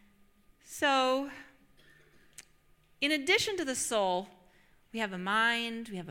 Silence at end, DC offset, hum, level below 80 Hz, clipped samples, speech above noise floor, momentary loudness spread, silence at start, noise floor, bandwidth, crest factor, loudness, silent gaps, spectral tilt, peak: 0 s; under 0.1%; none; -68 dBFS; under 0.1%; 34 dB; 16 LU; 0.65 s; -65 dBFS; 16.5 kHz; 20 dB; -30 LUFS; none; -2.5 dB/octave; -14 dBFS